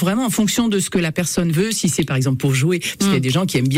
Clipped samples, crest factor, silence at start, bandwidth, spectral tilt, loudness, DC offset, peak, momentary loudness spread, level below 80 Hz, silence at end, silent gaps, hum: under 0.1%; 10 dB; 0 s; 16.5 kHz; -5 dB/octave; -18 LUFS; under 0.1%; -8 dBFS; 2 LU; -46 dBFS; 0 s; none; none